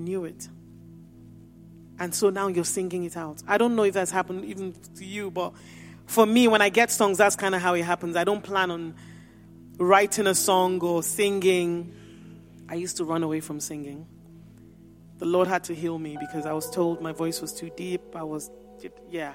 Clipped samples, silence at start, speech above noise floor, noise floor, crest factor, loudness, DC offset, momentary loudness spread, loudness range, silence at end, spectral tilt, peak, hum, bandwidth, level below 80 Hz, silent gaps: under 0.1%; 0 s; 25 dB; -50 dBFS; 24 dB; -25 LUFS; under 0.1%; 18 LU; 9 LU; 0 s; -3.5 dB/octave; -4 dBFS; none; 16.5 kHz; -62 dBFS; none